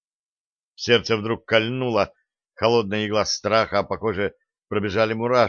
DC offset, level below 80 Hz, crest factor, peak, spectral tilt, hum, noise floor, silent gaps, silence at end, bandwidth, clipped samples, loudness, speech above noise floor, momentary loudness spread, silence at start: under 0.1%; -56 dBFS; 18 dB; -4 dBFS; -4.5 dB/octave; none; under -90 dBFS; none; 0 s; 7.2 kHz; under 0.1%; -22 LUFS; over 69 dB; 7 LU; 0.8 s